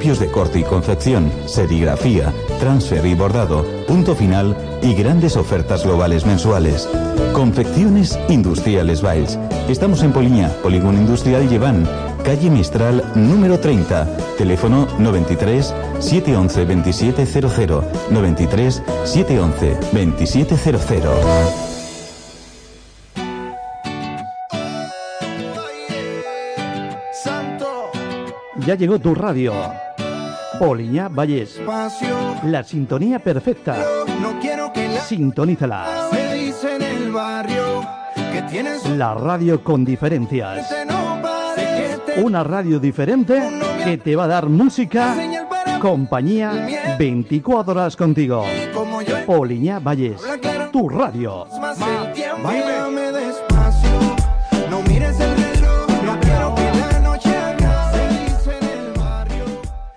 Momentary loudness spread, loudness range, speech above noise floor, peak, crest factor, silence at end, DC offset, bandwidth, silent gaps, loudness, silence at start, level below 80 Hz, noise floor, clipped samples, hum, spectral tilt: 11 LU; 6 LU; 26 dB; -6 dBFS; 12 dB; 0.05 s; under 0.1%; 10.5 kHz; none; -18 LUFS; 0 s; -26 dBFS; -42 dBFS; under 0.1%; none; -7 dB/octave